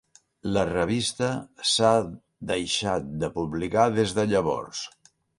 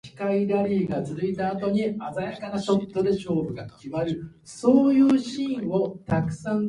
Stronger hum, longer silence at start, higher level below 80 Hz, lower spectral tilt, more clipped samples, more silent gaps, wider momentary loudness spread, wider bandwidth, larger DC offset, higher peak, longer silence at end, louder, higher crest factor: neither; first, 0.45 s vs 0.05 s; about the same, -52 dBFS vs -56 dBFS; second, -4.5 dB/octave vs -7.5 dB/octave; neither; neither; about the same, 14 LU vs 12 LU; about the same, 11.5 kHz vs 11 kHz; neither; about the same, -6 dBFS vs -6 dBFS; first, 0.5 s vs 0 s; about the same, -25 LUFS vs -25 LUFS; about the same, 20 dB vs 18 dB